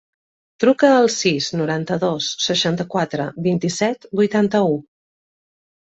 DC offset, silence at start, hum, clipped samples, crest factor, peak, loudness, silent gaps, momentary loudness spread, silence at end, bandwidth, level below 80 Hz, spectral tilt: under 0.1%; 0.6 s; none; under 0.1%; 18 dB; -2 dBFS; -19 LUFS; none; 8 LU; 1.1 s; 8.4 kHz; -60 dBFS; -4.5 dB/octave